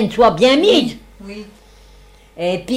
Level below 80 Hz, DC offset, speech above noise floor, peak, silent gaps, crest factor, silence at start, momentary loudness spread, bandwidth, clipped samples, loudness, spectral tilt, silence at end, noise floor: -44 dBFS; under 0.1%; 30 dB; -2 dBFS; none; 16 dB; 0 s; 23 LU; 14 kHz; under 0.1%; -14 LUFS; -5 dB/octave; 0 s; -45 dBFS